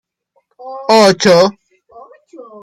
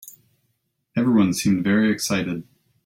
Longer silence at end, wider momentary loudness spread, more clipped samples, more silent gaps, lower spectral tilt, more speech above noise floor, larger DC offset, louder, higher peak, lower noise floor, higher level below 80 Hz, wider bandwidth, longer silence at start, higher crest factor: second, 0.2 s vs 0.45 s; first, 16 LU vs 11 LU; neither; neither; about the same, -4 dB/octave vs -5 dB/octave; about the same, 51 dB vs 52 dB; neither; first, -10 LUFS vs -21 LUFS; first, 0 dBFS vs -8 dBFS; second, -62 dBFS vs -72 dBFS; about the same, -58 dBFS vs -58 dBFS; about the same, 15.5 kHz vs 16.5 kHz; first, 0.65 s vs 0.05 s; about the same, 14 dB vs 16 dB